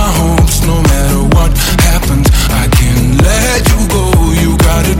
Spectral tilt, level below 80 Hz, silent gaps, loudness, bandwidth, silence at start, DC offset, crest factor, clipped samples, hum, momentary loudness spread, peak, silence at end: -5 dB/octave; -12 dBFS; none; -10 LUFS; 17 kHz; 0 s; under 0.1%; 8 dB; under 0.1%; none; 1 LU; 0 dBFS; 0 s